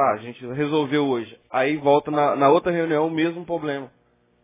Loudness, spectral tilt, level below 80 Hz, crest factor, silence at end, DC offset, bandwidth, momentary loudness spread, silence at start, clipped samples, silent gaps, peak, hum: -22 LUFS; -10 dB/octave; -62 dBFS; 18 dB; 0.55 s; under 0.1%; 3.9 kHz; 11 LU; 0 s; under 0.1%; none; -4 dBFS; none